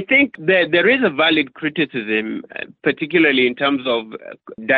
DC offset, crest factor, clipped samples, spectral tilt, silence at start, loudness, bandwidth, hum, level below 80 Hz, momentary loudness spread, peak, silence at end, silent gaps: under 0.1%; 16 dB; under 0.1%; -8 dB/octave; 0 s; -17 LUFS; 4.8 kHz; none; -62 dBFS; 15 LU; -2 dBFS; 0 s; none